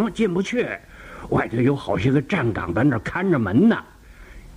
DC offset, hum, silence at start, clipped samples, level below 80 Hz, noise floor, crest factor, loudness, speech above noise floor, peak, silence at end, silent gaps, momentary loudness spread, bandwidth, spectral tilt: under 0.1%; none; 0 s; under 0.1%; -44 dBFS; -43 dBFS; 16 dB; -21 LUFS; 22 dB; -6 dBFS; 0 s; none; 9 LU; 11 kHz; -7.5 dB/octave